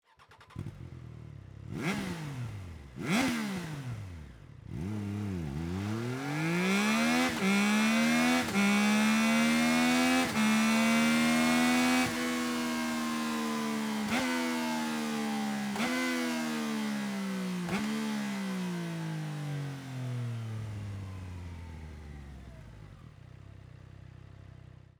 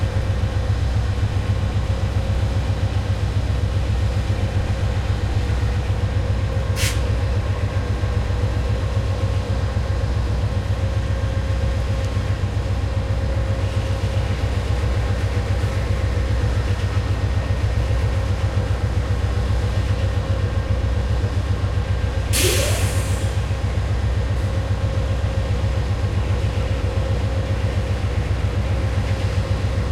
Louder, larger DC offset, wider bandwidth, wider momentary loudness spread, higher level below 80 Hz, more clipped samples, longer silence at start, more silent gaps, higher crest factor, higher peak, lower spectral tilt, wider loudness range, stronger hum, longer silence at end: second, -30 LUFS vs -22 LUFS; neither; first, over 20 kHz vs 15.5 kHz; first, 21 LU vs 2 LU; second, -58 dBFS vs -24 dBFS; neither; first, 0.3 s vs 0 s; neither; about the same, 16 dB vs 16 dB; second, -16 dBFS vs -4 dBFS; second, -4.5 dB/octave vs -6 dB/octave; first, 15 LU vs 2 LU; neither; first, 0.65 s vs 0 s